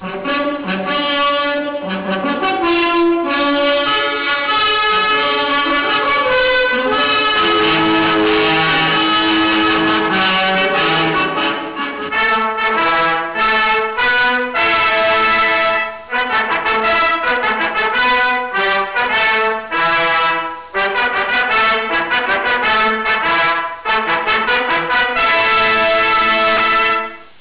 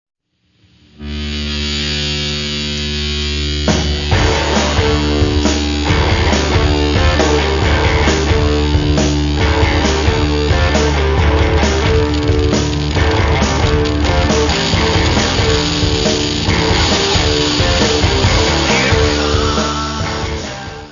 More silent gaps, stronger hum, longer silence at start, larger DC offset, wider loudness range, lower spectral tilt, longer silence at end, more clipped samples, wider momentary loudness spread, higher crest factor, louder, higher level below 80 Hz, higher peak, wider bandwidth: neither; neither; second, 0 s vs 1 s; neither; about the same, 2 LU vs 3 LU; first, -7 dB/octave vs -4.5 dB/octave; about the same, 0.1 s vs 0 s; neither; about the same, 6 LU vs 6 LU; second, 4 dB vs 14 dB; about the same, -14 LUFS vs -14 LUFS; second, -46 dBFS vs -20 dBFS; second, -10 dBFS vs 0 dBFS; second, 4 kHz vs 7.4 kHz